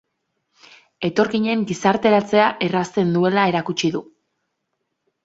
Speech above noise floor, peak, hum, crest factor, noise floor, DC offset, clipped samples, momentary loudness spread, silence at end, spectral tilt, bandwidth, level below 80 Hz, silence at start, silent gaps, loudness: 57 dB; -2 dBFS; none; 18 dB; -75 dBFS; under 0.1%; under 0.1%; 7 LU; 1.2 s; -5.5 dB/octave; 8 kHz; -62 dBFS; 1 s; none; -19 LUFS